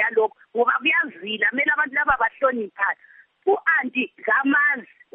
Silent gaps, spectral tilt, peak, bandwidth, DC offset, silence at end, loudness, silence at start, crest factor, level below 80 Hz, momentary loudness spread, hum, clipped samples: none; 0 dB/octave; -6 dBFS; 3.8 kHz; under 0.1%; 0.3 s; -21 LUFS; 0 s; 16 dB; -58 dBFS; 7 LU; none; under 0.1%